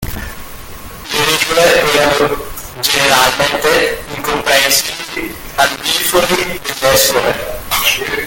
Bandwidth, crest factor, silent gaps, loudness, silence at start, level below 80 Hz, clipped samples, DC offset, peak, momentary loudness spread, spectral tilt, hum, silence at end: 17.5 kHz; 14 dB; none; -12 LUFS; 0 s; -34 dBFS; under 0.1%; under 0.1%; 0 dBFS; 15 LU; -1.5 dB/octave; none; 0 s